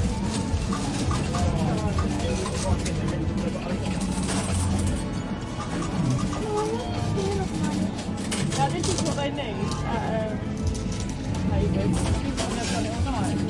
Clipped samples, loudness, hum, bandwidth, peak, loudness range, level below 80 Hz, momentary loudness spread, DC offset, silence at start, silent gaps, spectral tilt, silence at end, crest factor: under 0.1%; -27 LUFS; none; 11.5 kHz; -10 dBFS; 1 LU; -36 dBFS; 4 LU; under 0.1%; 0 s; none; -5.5 dB/octave; 0 s; 16 dB